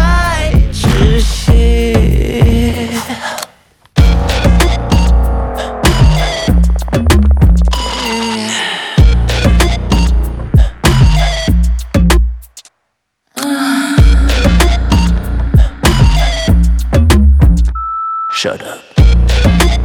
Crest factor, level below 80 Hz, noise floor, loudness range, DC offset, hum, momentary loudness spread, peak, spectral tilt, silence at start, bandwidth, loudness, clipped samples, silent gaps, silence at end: 10 dB; -12 dBFS; -67 dBFS; 2 LU; under 0.1%; none; 8 LU; 0 dBFS; -5.5 dB/octave; 0 s; 16 kHz; -12 LUFS; under 0.1%; none; 0 s